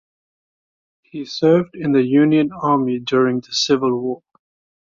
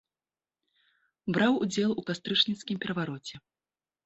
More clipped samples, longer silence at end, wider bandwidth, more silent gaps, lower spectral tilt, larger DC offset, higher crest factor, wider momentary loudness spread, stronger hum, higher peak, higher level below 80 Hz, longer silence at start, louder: neither; about the same, 0.7 s vs 0.7 s; about the same, 7.6 kHz vs 8.2 kHz; neither; about the same, -5.5 dB/octave vs -4.5 dB/octave; neither; second, 16 dB vs 22 dB; about the same, 14 LU vs 13 LU; neither; first, -4 dBFS vs -10 dBFS; first, -60 dBFS vs -70 dBFS; about the same, 1.15 s vs 1.25 s; first, -17 LUFS vs -29 LUFS